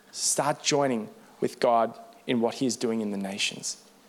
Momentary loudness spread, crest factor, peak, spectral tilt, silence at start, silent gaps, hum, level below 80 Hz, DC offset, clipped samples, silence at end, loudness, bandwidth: 10 LU; 18 dB; -10 dBFS; -3 dB/octave; 0.15 s; none; none; -76 dBFS; under 0.1%; under 0.1%; 0.3 s; -27 LUFS; 17 kHz